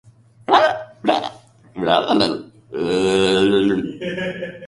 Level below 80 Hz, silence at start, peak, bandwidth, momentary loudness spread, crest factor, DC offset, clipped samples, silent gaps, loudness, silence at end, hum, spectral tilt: -52 dBFS; 0.5 s; -2 dBFS; 11.5 kHz; 15 LU; 18 dB; under 0.1%; under 0.1%; none; -18 LUFS; 0 s; none; -5 dB/octave